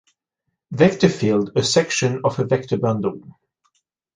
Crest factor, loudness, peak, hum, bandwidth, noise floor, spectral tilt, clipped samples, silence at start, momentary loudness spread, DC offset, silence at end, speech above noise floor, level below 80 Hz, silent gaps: 20 dB; -19 LUFS; -2 dBFS; none; 10 kHz; -78 dBFS; -5 dB/octave; under 0.1%; 0.7 s; 9 LU; under 0.1%; 0.95 s; 59 dB; -56 dBFS; none